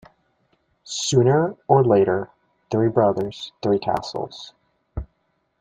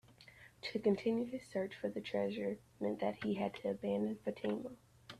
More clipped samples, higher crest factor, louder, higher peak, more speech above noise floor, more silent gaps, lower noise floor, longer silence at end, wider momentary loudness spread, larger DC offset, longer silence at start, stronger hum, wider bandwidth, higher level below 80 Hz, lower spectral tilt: neither; about the same, 20 dB vs 18 dB; first, -21 LUFS vs -39 LUFS; first, -2 dBFS vs -22 dBFS; first, 50 dB vs 22 dB; neither; first, -70 dBFS vs -61 dBFS; first, 0.55 s vs 0 s; first, 19 LU vs 10 LU; neither; first, 0.85 s vs 0.1 s; neither; second, 9.4 kHz vs 13 kHz; first, -46 dBFS vs -74 dBFS; about the same, -6 dB/octave vs -7 dB/octave